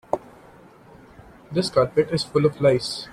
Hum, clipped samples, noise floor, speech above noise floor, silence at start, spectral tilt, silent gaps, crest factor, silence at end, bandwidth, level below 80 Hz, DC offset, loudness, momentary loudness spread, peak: none; under 0.1%; -49 dBFS; 28 dB; 0.15 s; -6 dB/octave; none; 20 dB; 0 s; 14 kHz; -54 dBFS; under 0.1%; -22 LUFS; 10 LU; -4 dBFS